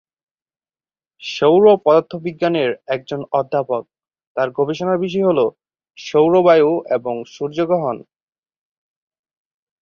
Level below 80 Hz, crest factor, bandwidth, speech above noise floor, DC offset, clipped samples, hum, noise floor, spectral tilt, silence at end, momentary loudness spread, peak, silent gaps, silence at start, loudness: -62 dBFS; 18 dB; 7 kHz; over 74 dB; under 0.1%; under 0.1%; none; under -90 dBFS; -6.5 dB/octave; 1.8 s; 14 LU; 0 dBFS; 4.27-4.35 s; 1.2 s; -17 LUFS